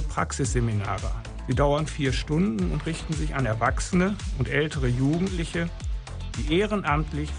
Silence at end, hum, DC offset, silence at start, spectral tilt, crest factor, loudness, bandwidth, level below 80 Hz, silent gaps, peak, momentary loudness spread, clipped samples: 0 s; none; under 0.1%; 0 s; -6 dB/octave; 16 dB; -26 LUFS; 10.5 kHz; -32 dBFS; none; -8 dBFS; 8 LU; under 0.1%